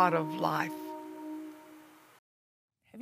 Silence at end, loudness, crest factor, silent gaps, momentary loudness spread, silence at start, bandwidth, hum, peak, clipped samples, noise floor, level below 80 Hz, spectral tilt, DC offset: 0 s; -34 LUFS; 22 dB; 2.19-2.68 s; 24 LU; 0 s; 15.5 kHz; none; -12 dBFS; under 0.1%; -56 dBFS; -82 dBFS; -6 dB/octave; under 0.1%